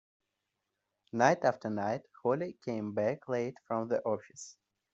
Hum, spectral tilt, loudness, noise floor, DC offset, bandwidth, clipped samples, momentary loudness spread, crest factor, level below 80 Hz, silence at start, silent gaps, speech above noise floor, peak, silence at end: none; -5.5 dB/octave; -33 LUFS; -85 dBFS; under 0.1%; 8 kHz; under 0.1%; 12 LU; 24 dB; -78 dBFS; 1.15 s; none; 53 dB; -10 dBFS; 0.45 s